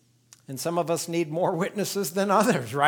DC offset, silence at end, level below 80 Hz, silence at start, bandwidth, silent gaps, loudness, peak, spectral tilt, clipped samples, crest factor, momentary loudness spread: under 0.1%; 0 s; -74 dBFS; 0.5 s; over 20 kHz; none; -26 LUFS; -6 dBFS; -4.5 dB/octave; under 0.1%; 20 dB; 7 LU